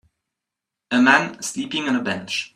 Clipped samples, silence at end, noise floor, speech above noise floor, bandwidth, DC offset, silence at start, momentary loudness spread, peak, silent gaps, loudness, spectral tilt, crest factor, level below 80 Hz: under 0.1%; 0.1 s; -85 dBFS; 64 dB; 13 kHz; under 0.1%; 0.9 s; 11 LU; 0 dBFS; none; -20 LUFS; -3 dB/octave; 22 dB; -66 dBFS